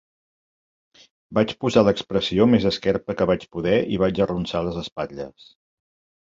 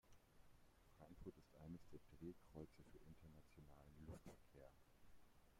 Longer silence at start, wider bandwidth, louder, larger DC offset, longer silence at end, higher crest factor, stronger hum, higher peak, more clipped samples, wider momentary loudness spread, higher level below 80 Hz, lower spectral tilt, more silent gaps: first, 1.3 s vs 0.05 s; second, 7.8 kHz vs 16 kHz; first, -22 LUFS vs -64 LUFS; neither; first, 1 s vs 0 s; about the same, 22 dB vs 20 dB; neither; first, -2 dBFS vs -44 dBFS; neither; first, 12 LU vs 8 LU; first, -48 dBFS vs -72 dBFS; about the same, -6.5 dB/octave vs -7 dB/octave; first, 4.92-4.96 s vs none